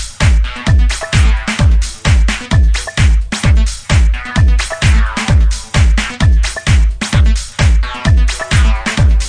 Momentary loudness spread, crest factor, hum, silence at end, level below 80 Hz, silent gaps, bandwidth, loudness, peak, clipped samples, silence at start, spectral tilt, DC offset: 2 LU; 10 dB; none; 0 s; -12 dBFS; none; 10.5 kHz; -13 LUFS; 0 dBFS; under 0.1%; 0 s; -4.5 dB/octave; under 0.1%